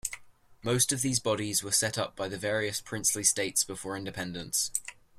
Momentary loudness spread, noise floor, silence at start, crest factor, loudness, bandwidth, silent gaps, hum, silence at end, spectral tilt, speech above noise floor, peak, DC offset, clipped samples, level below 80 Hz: 11 LU; -54 dBFS; 0.05 s; 24 dB; -29 LUFS; 16 kHz; none; none; 0.25 s; -2.5 dB/octave; 23 dB; -8 dBFS; under 0.1%; under 0.1%; -62 dBFS